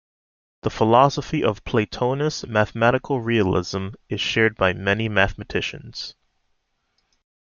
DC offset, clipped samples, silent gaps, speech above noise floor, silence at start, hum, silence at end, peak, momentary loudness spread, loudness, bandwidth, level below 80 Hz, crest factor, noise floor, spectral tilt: under 0.1%; under 0.1%; none; 49 dB; 0.65 s; none; 1.45 s; -2 dBFS; 12 LU; -21 LUFS; 7.2 kHz; -46 dBFS; 22 dB; -71 dBFS; -5.5 dB/octave